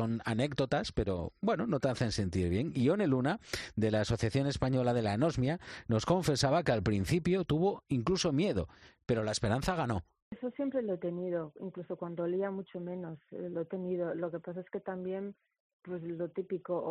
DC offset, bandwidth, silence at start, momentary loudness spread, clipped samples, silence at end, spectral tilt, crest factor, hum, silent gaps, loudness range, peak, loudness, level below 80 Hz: under 0.1%; 11.5 kHz; 0 s; 12 LU; under 0.1%; 0 s; -6 dB/octave; 16 dB; none; 10.22-10.31 s, 15.60-15.80 s; 8 LU; -16 dBFS; -33 LUFS; -54 dBFS